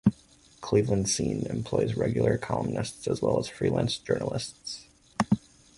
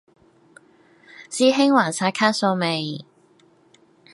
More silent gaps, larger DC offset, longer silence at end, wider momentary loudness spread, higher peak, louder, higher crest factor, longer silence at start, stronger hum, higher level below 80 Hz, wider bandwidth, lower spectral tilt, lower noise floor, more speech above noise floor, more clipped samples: neither; neither; second, 0.4 s vs 1.1 s; second, 10 LU vs 14 LU; second, -8 dBFS vs -2 dBFS; second, -28 LUFS vs -20 LUFS; about the same, 20 dB vs 20 dB; second, 0.05 s vs 1.2 s; neither; first, -52 dBFS vs -74 dBFS; about the same, 11.5 kHz vs 11.5 kHz; first, -5.5 dB/octave vs -4 dB/octave; about the same, -57 dBFS vs -57 dBFS; second, 30 dB vs 37 dB; neither